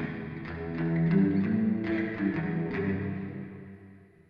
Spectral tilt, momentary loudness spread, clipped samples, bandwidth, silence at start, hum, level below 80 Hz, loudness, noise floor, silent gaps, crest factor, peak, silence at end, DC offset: -10.5 dB/octave; 15 LU; under 0.1%; 5.2 kHz; 0 s; none; -56 dBFS; -30 LUFS; -53 dBFS; none; 16 dB; -14 dBFS; 0.25 s; under 0.1%